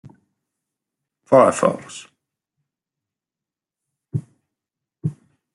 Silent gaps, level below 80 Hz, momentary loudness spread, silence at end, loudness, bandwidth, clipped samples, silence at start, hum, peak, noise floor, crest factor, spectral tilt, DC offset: none; -66 dBFS; 19 LU; 0.4 s; -19 LUFS; 11.5 kHz; under 0.1%; 1.3 s; none; -2 dBFS; -89 dBFS; 24 dB; -6 dB/octave; under 0.1%